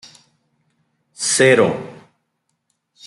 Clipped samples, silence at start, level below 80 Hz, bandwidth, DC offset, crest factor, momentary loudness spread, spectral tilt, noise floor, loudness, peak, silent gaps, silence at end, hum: under 0.1%; 1.2 s; -64 dBFS; 12 kHz; under 0.1%; 20 dB; 18 LU; -3.5 dB/octave; -72 dBFS; -15 LUFS; -2 dBFS; none; 1.15 s; none